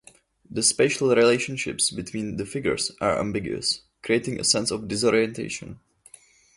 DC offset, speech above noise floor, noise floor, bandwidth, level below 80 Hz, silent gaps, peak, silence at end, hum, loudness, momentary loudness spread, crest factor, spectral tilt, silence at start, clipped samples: under 0.1%; 29 dB; -53 dBFS; 11.5 kHz; -54 dBFS; none; -6 dBFS; 0.8 s; none; -23 LUFS; 11 LU; 20 dB; -3 dB/octave; 0.5 s; under 0.1%